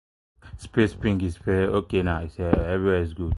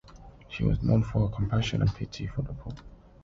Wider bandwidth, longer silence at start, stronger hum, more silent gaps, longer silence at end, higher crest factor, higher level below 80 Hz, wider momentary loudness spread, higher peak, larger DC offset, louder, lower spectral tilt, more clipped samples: first, 11.5 kHz vs 7.6 kHz; first, 0.45 s vs 0.1 s; neither; neither; second, 0 s vs 0.3 s; about the same, 20 dB vs 16 dB; first, -34 dBFS vs -40 dBFS; second, 5 LU vs 16 LU; first, -4 dBFS vs -14 dBFS; neither; first, -25 LUFS vs -29 LUFS; about the same, -8 dB/octave vs -7.5 dB/octave; neither